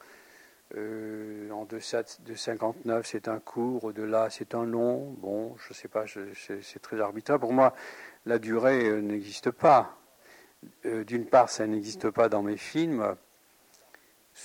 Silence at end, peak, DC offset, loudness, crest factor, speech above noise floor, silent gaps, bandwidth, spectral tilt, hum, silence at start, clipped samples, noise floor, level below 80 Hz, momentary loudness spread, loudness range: 0 s; -8 dBFS; under 0.1%; -29 LUFS; 22 dB; 33 dB; none; 17 kHz; -5.5 dB/octave; none; 0.75 s; under 0.1%; -62 dBFS; -74 dBFS; 17 LU; 8 LU